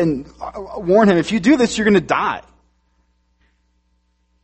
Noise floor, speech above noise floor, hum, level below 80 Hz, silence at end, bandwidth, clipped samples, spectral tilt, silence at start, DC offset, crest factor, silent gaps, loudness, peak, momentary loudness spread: -64 dBFS; 47 dB; none; -48 dBFS; 2.05 s; 8.8 kHz; under 0.1%; -5.5 dB/octave; 0 s; under 0.1%; 18 dB; none; -16 LUFS; 0 dBFS; 17 LU